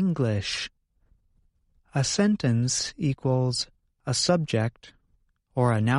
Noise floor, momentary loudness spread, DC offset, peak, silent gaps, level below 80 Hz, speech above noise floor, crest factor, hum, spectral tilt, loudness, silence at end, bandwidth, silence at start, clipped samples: -68 dBFS; 9 LU; under 0.1%; -8 dBFS; none; -56 dBFS; 43 dB; 18 dB; none; -5 dB/octave; -26 LUFS; 0 s; 11.5 kHz; 0 s; under 0.1%